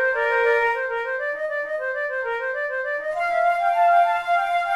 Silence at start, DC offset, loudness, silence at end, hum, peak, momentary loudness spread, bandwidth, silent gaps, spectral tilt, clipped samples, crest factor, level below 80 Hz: 0 s; under 0.1%; -22 LUFS; 0 s; none; -8 dBFS; 8 LU; 12 kHz; none; -1.5 dB/octave; under 0.1%; 14 dB; -60 dBFS